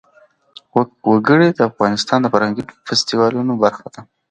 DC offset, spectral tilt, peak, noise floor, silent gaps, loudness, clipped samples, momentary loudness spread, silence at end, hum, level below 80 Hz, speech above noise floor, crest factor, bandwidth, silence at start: under 0.1%; -5 dB/octave; 0 dBFS; -53 dBFS; none; -16 LUFS; under 0.1%; 8 LU; 0.3 s; none; -58 dBFS; 37 dB; 16 dB; 9.2 kHz; 0.75 s